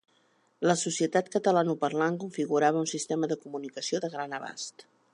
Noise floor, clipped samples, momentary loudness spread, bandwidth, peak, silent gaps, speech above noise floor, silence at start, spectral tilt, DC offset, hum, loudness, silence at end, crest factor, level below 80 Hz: -68 dBFS; under 0.1%; 11 LU; 11.5 kHz; -10 dBFS; none; 39 dB; 0.6 s; -4.5 dB/octave; under 0.1%; none; -29 LUFS; 0.3 s; 20 dB; -82 dBFS